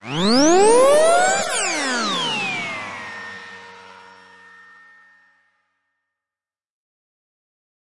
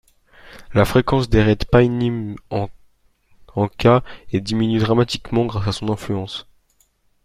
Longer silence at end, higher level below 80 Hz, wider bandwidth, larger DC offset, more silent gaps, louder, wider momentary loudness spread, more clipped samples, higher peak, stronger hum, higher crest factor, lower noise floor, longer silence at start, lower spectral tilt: first, 1.15 s vs 0.85 s; second, -60 dBFS vs -36 dBFS; second, 11.5 kHz vs 15.5 kHz; neither; neither; about the same, -17 LUFS vs -19 LUFS; first, 21 LU vs 11 LU; neither; about the same, -4 dBFS vs -2 dBFS; neither; about the same, 18 dB vs 18 dB; first, under -90 dBFS vs -61 dBFS; second, 0 s vs 0.5 s; second, -2.5 dB/octave vs -7 dB/octave